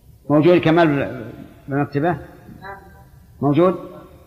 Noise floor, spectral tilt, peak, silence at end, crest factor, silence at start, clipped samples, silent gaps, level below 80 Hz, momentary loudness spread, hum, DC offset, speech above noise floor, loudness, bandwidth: -45 dBFS; -8.5 dB/octave; -2 dBFS; 0.25 s; 16 dB; 0.3 s; under 0.1%; none; -50 dBFS; 23 LU; none; under 0.1%; 28 dB; -18 LUFS; 6.4 kHz